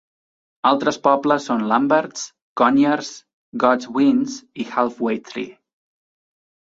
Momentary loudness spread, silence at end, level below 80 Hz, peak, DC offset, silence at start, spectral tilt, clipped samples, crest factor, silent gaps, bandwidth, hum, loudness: 14 LU; 1.25 s; -66 dBFS; -2 dBFS; under 0.1%; 0.65 s; -4.5 dB/octave; under 0.1%; 18 dB; 2.42-2.56 s, 3.33-3.52 s; 7.8 kHz; none; -19 LUFS